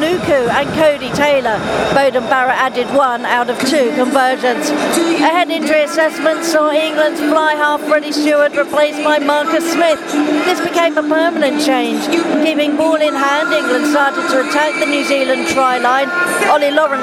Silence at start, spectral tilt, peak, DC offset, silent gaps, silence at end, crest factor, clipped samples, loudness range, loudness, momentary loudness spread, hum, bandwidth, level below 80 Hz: 0 s; -3.5 dB/octave; 0 dBFS; under 0.1%; none; 0 s; 14 dB; under 0.1%; 1 LU; -13 LUFS; 2 LU; none; 16.5 kHz; -52 dBFS